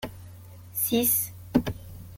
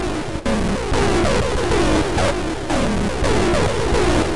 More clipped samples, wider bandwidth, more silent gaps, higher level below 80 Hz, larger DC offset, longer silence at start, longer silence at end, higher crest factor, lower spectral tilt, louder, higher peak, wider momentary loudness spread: neither; first, 17 kHz vs 11.5 kHz; neither; second, -50 dBFS vs -26 dBFS; second, under 0.1% vs 4%; about the same, 0 s vs 0 s; about the same, 0 s vs 0 s; first, 22 dB vs 10 dB; about the same, -4 dB/octave vs -5 dB/octave; second, -26 LUFS vs -19 LUFS; about the same, -8 dBFS vs -10 dBFS; first, 21 LU vs 5 LU